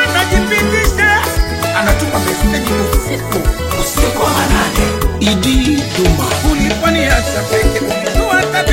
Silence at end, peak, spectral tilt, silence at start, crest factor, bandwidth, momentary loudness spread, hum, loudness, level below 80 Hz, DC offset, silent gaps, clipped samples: 0 s; 0 dBFS; -4 dB/octave; 0 s; 12 dB; 17 kHz; 5 LU; none; -13 LUFS; -18 dBFS; under 0.1%; none; under 0.1%